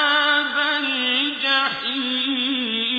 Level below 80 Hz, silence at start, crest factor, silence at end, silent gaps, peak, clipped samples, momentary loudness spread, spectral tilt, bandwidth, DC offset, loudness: -66 dBFS; 0 s; 14 dB; 0 s; none; -6 dBFS; under 0.1%; 4 LU; -3 dB/octave; 5 kHz; under 0.1%; -20 LUFS